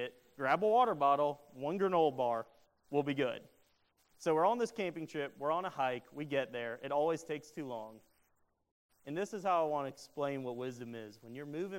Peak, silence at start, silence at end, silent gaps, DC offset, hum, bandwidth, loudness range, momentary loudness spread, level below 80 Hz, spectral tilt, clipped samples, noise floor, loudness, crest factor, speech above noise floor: -16 dBFS; 0 s; 0 s; 8.71-8.89 s; under 0.1%; none; 16 kHz; 6 LU; 14 LU; -80 dBFS; -5.5 dB/octave; under 0.1%; -76 dBFS; -35 LUFS; 20 dB; 41 dB